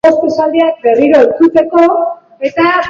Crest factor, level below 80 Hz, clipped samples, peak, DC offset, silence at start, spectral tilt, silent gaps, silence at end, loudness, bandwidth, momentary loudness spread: 10 dB; -50 dBFS; under 0.1%; 0 dBFS; under 0.1%; 0.05 s; -6 dB/octave; none; 0 s; -10 LUFS; 7.2 kHz; 9 LU